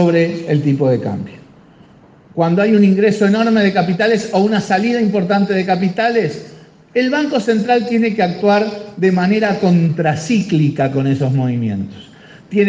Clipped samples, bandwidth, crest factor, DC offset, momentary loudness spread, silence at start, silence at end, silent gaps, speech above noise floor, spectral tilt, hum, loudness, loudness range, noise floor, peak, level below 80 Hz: under 0.1%; 9 kHz; 14 dB; under 0.1%; 8 LU; 0 s; 0 s; none; 30 dB; -7 dB/octave; none; -15 LUFS; 2 LU; -44 dBFS; 0 dBFS; -58 dBFS